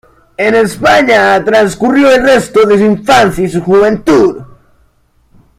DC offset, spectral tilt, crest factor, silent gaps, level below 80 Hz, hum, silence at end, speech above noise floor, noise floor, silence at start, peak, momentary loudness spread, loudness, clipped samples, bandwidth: under 0.1%; -5 dB/octave; 10 dB; none; -38 dBFS; none; 1.15 s; 43 dB; -51 dBFS; 0.4 s; 0 dBFS; 6 LU; -8 LUFS; under 0.1%; 15.5 kHz